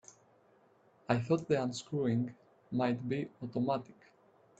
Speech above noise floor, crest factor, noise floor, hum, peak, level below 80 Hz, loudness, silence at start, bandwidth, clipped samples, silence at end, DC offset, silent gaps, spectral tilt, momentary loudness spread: 33 dB; 24 dB; -67 dBFS; none; -12 dBFS; -72 dBFS; -35 LUFS; 1.1 s; 8.6 kHz; under 0.1%; 0.7 s; under 0.1%; none; -7 dB/octave; 8 LU